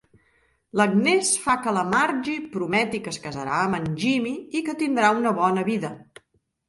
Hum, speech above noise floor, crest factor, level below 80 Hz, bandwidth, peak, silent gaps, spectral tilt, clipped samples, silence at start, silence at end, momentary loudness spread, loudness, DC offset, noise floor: none; 44 dB; 18 dB; -62 dBFS; 11.5 kHz; -6 dBFS; none; -4 dB/octave; under 0.1%; 0.75 s; 0.7 s; 10 LU; -23 LUFS; under 0.1%; -67 dBFS